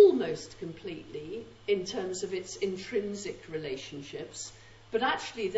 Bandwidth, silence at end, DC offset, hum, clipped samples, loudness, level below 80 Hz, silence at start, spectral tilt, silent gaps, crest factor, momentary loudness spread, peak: 8 kHz; 0 s; under 0.1%; none; under 0.1%; -34 LUFS; -62 dBFS; 0 s; -4 dB/octave; none; 22 dB; 12 LU; -10 dBFS